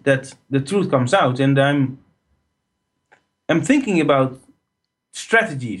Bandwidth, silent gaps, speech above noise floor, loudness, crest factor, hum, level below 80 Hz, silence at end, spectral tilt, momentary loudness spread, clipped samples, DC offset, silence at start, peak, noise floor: 11.5 kHz; none; 59 dB; -18 LUFS; 18 dB; none; -62 dBFS; 0 s; -6 dB/octave; 9 LU; under 0.1%; under 0.1%; 0.05 s; -2 dBFS; -77 dBFS